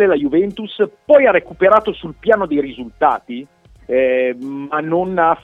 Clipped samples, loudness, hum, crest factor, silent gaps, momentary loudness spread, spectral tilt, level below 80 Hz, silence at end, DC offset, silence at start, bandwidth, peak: under 0.1%; -16 LUFS; none; 16 dB; none; 12 LU; -7.5 dB/octave; -48 dBFS; 0.05 s; under 0.1%; 0 s; 4.3 kHz; 0 dBFS